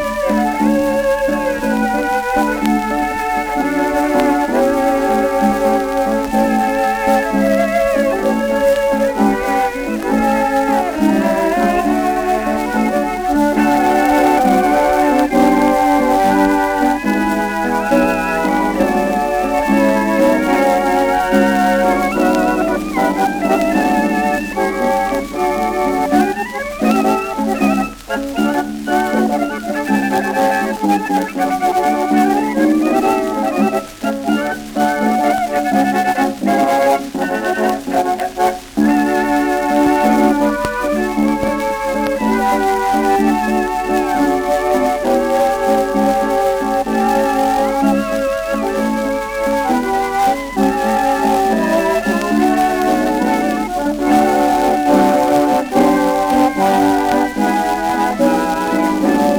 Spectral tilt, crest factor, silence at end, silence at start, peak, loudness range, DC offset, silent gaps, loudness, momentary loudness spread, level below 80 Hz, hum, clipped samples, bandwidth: -5 dB/octave; 14 dB; 0 s; 0 s; 0 dBFS; 3 LU; under 0.1%; none; -15 LUFS; 5 LU; -38 dBFS; none; under 0.1%; over 20 kHz